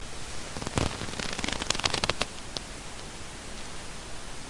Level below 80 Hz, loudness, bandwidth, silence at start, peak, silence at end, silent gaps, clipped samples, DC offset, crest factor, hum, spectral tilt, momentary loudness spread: -44 dBFS; -33 LUFS; 11.5 kHz; 0 s; -2 dBFS; 0 s; none; under 0.1%; under 0.1%; 32 dB; none; -2.5 dB/octave; 13 LU